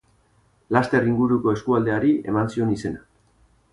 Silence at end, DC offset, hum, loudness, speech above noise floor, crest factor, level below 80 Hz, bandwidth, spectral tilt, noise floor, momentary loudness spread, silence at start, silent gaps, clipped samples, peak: 0.75 s; under 0.1%; none; -22 LUFS; 40 dB; 18 dB; -52 dBFS; 11 kHz; -8 dB/octave; -61 dBFS; 7 LU; 0.7 s; none; under 0.1%; -4 dBFS